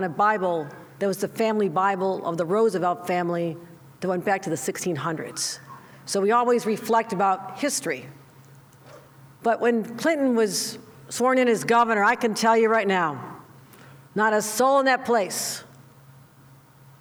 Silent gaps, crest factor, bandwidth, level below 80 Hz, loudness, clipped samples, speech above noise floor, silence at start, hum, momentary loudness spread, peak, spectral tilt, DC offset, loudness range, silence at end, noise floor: none; 16 dB; over 20 kHz; -72 dBFS; -23 LUFS; under 0.1%; 29 dB; 0 s; none; 11 LU; -8 dBFS; -4 dB/octave; under 0.1%; 5 LU; 1.35 s; -52 dBFS